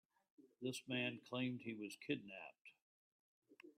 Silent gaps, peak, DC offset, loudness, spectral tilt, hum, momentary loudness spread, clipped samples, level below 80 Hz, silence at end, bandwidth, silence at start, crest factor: 2.61-2.65 s, 2.82-3.42 s; -28 dBFS; under 0.1%; -46 LUFS; -4.5 dB/octave; none; 19 LU; under 0.1%; -90 dBFS; 0.05 s; 13 kHz; 0.4 s; 20 dB